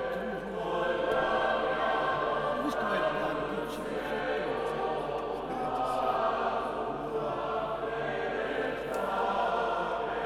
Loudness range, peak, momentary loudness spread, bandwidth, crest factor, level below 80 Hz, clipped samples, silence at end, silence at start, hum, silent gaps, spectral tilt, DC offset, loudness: 2 LU; -16 dBFS; 5 LU; 15.5 kHz; 16 dB; -56 dBFS; under 0.1%; 0 s; 0 s; none; none; -5.5 dB/octave; under 0.1%; -31 LUFS